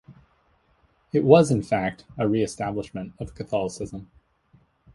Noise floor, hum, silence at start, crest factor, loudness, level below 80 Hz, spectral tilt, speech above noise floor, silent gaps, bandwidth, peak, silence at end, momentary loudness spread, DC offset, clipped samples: -64 dBFS; none; 0.1 s; 24 dB; -23 LUFS; -52 dBFS; -6.5 dB/octave; 41 dB; none; 11.5 kHz; 0 dBFS; 0.9 s; 19 LU; under 0.1%; under 0.1%